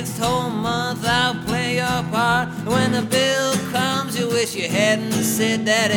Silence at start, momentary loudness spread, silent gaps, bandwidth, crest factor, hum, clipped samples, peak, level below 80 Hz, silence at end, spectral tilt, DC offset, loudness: 0 s; 4 LU; none; over 20 kHz; 16 dB; none; under 0.1%; -4 dBFS; -48 dBFS; 0 s; -4 dB/octave; under 0.1%; -20 LUFS